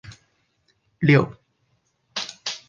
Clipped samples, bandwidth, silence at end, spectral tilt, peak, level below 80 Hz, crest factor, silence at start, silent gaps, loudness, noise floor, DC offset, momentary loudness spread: under 0.1%; 7.4 kHz; 0.1 s; -6 dB/octave; -4 dBFS; -60 dBFS; 22 dB; 0.05 s; none; -22 LUFS; -69 dBFS; under 0.1%; 14 LU